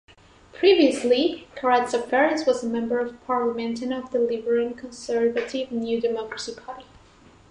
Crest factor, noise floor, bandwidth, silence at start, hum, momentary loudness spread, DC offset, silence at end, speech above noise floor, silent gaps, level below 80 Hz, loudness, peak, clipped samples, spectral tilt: 18 dB; -52 dBFS; 11 kHz; 0.55 s; none; 13 LU; under 0.1%; 0.7 s; 29 dB; none; -60 dBFS; -23 LUFS; -6 dBFS; under 0.1%; -4 dB/octave